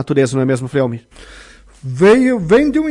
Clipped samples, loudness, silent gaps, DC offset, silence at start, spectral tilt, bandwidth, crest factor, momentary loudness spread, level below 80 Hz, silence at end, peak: under 0.1%; -13 LUFS; none; under 0.1%; 0 s; -7 dB/octave; 11.5 kHz; 12 dB; 17 LU; -42 dBFS; 0 s; -2 dBFS